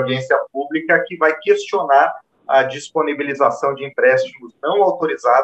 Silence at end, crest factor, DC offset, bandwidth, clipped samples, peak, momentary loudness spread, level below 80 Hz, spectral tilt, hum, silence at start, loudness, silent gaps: 0 s; 16 dB; under 0.1%; 8.6 kHz; under 0.1%; -2 dBFS; 7 LU; -72 dBFS; -5 dB/octave; none; 0 s; -17 LUFS; none